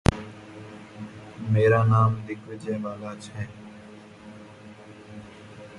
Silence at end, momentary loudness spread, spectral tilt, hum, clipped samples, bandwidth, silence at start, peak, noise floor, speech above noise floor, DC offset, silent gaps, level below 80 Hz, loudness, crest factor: 0 s; 26 LU; -7.5 dB/octave; none; under 0.1%; 11.5 kHz; 0.1 s; 0 dBFS; -46 dBFS; 22 dB; under 0.1%; none; -44 dBFS; -25 LUFS; 26 dB